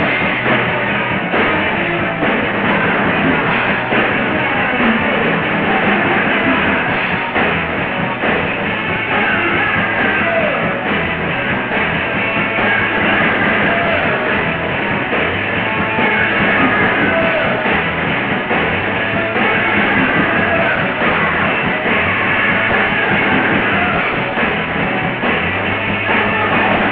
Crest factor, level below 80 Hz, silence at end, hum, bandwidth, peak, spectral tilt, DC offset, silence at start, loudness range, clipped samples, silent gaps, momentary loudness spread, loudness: 14 dB; -40 dBFS; 0 s; none; 5 kHz; 0 dBFS; -9.5 dB/octave; under 0.1%; 0 s; 2 LU; under 0.1%; none; 4 LU; -14 LUFS